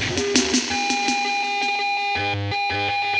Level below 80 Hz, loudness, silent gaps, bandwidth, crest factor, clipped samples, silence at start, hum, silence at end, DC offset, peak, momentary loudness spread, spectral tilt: -52 dBFS; -21 LUFS; none; 11.5 kHz; 22 dB; under 0.1%; 0 s; none; 0 s; under 0.1%; 0 dBFS; 4 LU; -2.5 dB/octave